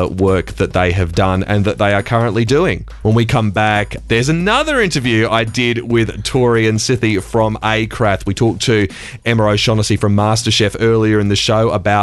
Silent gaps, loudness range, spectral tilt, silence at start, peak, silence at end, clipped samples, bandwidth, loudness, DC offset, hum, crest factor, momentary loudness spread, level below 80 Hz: none; 1 LU; -5.5 dB/octave; 0 s; 0 dBFS; 0 s; under 0.1%; 12.5 kHz; -14 LUFS; under 0.1%; none; 14 dB; 3 LU; -32 dBFS